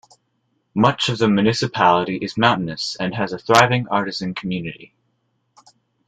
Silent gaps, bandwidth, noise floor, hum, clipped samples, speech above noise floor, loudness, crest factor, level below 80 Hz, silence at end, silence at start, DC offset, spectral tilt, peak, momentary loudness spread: none; 15 kHz; -69 dBFS; none; under 0.1%; 50 dB; -19 LUFS; 20 dB; -56 dBFS; 1.2 s; 0.75 s; under 0.1%; -5 dB/octave; 0 dBFS; 11 LU